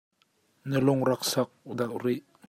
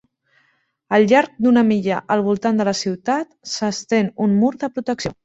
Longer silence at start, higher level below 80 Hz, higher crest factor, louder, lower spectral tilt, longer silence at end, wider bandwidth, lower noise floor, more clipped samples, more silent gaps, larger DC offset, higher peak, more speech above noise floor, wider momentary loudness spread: second, 0.65 s vs 0.9 s; second, -68 dBFS vs -56 dBFS; about the same, 18 dB vs 16 dB; second, -28 LUFS vs -19 LUFS; about the same, -5.5 dB/octave vs -5.5 dB/octave; first, 0.3 s vs 0.1 s; first, 16 kHz vs 8 kHz; first, -69 dBFS vs -64 dBFS; neither; neither; neither; second, -10 dBFS vs -2 dBFS; second, 42 dB vs 46 dB; about the same, 9 LU vs 9 LU